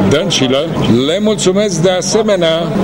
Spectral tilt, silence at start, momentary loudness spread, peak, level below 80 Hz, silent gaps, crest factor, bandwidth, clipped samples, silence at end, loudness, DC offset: -4.5 dB/octave; 0 s; 2 LU; 0 dBFS; -38 dBFS; none; 12 dB; 16.5 kHz; under 0.1%; 0 s; -12 LUFS; under 0.1%